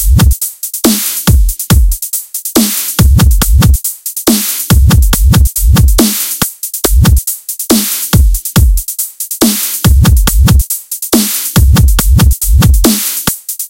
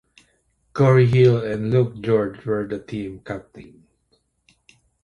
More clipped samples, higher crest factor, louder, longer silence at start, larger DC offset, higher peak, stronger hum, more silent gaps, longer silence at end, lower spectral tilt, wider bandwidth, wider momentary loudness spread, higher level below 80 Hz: first, 0.7% vs under 0.1%; second, 8 dB vs 18 dB; first, -9 LUFS vs -20 LUFS; second, 0 s vs 0.75 s; neither; first, 0 dBFS vs -4 dBFS; neither; neither; second, 0 s vs 1.4 s; second, -4.5 dB/octave vs -9 dB/octave; first, 17.5 kHz vs 7 kHz; second, 7 LU vs 18 LU; first, -10 dBFS vs -52 dBFS